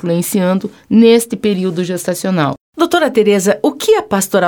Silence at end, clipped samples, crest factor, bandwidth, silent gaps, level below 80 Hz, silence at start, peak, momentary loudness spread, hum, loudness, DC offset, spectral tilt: 0 s; under 0.1%; 12 dB; 19.5 kHz; 2.60-2.73 s; -56 dBFS; 0.05 s; 0 dBFS; 8 LU; none; -13 LUFS; under 0.1%; -5 dB/octave